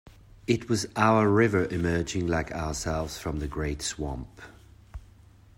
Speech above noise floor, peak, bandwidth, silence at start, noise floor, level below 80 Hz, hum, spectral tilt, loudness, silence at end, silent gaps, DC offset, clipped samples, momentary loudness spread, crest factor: 27 dB; -8 dBFS; 16 kHz; 0.05 s; -54 dBFS; -44 dBFS; none; -5.5 dB/octave; -27 LUFS; 0.55 s; none; under 0.1%; under 0.1%; 21 LU; 20 dB